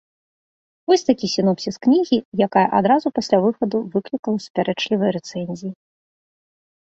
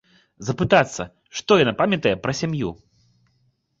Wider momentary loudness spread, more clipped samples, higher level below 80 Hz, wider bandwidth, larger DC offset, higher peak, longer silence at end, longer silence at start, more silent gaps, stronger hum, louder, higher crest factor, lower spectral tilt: second, 11 LU vs 14 LU; neither; second, -62 dBFS vs -50 dBFS; about the same, 8 kHz vs 7.8 kHz; neither; about the same, -2 dBFS vs -2 dBFS; about the same, 1.1 s vs 1.05 s; first, 0.9 s vs 0.4 s; first, 2.25-2.32 s, 4.19-4.23 s, 4.50-4.54 s vs none; neither; about the same, -20 LUFS vs -21 LUFS; about the same, 18 dB vs 20 dB; about the same, -6 dB/octave vs -5 dB/octave